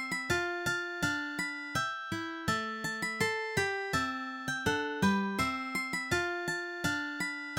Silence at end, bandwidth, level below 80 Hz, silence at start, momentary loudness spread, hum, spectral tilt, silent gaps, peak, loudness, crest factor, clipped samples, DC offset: 0 s; 17 kHz; -60 dBFS; 0 s; 5 LU; none; -4 dB/octave; none; -16 dBFS; -33 LUFS; 18 dB; under 0.1%; under 0.1%